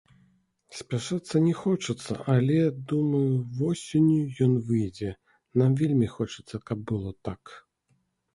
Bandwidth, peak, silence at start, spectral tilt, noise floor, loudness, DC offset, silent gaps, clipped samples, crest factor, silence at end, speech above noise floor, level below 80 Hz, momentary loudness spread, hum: 11.5 kHz; -10 dBFS; 0.7 s; -7.5 dB/octave; -71 dBFS; -27 LUFS; under 0.1%; none; under 0.1%; 18 dB; 0.75 s; 46 dB; -56 dBFS; 13 LU; none